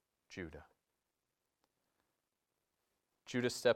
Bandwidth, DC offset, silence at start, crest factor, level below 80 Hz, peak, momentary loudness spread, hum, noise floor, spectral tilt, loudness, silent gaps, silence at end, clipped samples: 16 kHz; under 0.1%; 0.3 s; 26 dB; -76 dBFS; -18 dBFS; 22 LU; none; -89 dBFS; -4 dB/octave; -41 LUFS; none; 0 s; under 0.1%